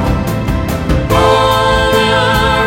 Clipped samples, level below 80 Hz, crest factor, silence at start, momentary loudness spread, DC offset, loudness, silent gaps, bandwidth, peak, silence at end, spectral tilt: under 0.1%; -20 dBFS; 12 dB; 0 s; 7 LU; under 0.1%; -12 LUFS; none; 16.5 kHz; 0 dBFS; 0 s; -5 dB/octave